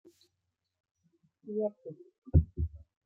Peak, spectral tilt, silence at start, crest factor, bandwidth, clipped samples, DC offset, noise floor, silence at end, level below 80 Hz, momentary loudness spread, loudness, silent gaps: -10 dBFS; -12 dB/octave; 1.45 s; 24 dB; 4.2 kHz; under 0.1%; under 0.1%; -84 dBFS; 0.3 s; -42 dBFS; 22 LU; -33 LUFS; 2.18-2.22 s